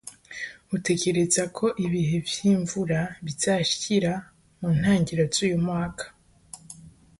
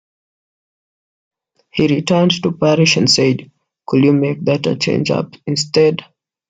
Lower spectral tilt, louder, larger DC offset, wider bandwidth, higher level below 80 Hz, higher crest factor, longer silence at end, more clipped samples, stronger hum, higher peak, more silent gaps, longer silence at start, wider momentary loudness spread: about the same, -4.5 dB/octave vs -5 dB/octave; second, -25 LUFS vs -15 LUFS; neither; first, 11.5 kHz vs 9.4 kHz; about the same, -54 dBFS vs -56 dBFS; about the same, 16 dB vs 16 dB; second, 0.3 s vs 0.45 s; neither; neither; second, -10 dBFS vs 0 dBFS; neither; second, 0.05 s vs 1.75 s; first, 17 LU vs 9 LU